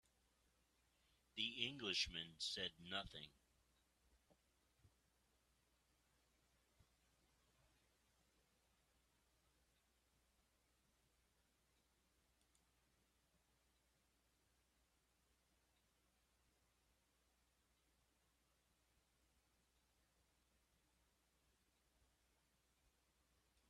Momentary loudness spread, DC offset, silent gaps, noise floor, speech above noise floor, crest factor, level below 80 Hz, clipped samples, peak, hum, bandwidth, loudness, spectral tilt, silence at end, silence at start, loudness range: 14 LU; under 0.1%; none; -83 dBFS; 34 dB; 34 dB; -80 dBFS; under 0.1%; -26 dBFS; none; 13 kHz; -46 LUFS; -2 dB/octave; 20.4 s; 1.35 s; 11 LU